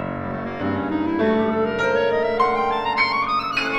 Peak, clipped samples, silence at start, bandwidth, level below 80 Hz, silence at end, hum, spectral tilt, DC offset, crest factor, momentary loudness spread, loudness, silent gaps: -6 dBFS; under 0.1%; 0 s; 8.4 kHz; -50 dBFS; 0 s; none; -6 dB/octave; under 0.1%; 16 dB; 7 LU; -21 LUFS; none